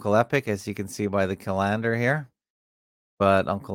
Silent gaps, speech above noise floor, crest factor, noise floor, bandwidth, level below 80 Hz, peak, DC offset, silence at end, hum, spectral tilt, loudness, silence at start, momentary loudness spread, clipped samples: 2.50-3.17 s; over 66 dB; 20 dB; under -90 dBFS; 17 kHz; -62 dBFS; -6 dBFS; under 0.1%; 0 s; none; -6.5 dB/octave; -25 LUFS; 0 s; 8 LU; under 0.1%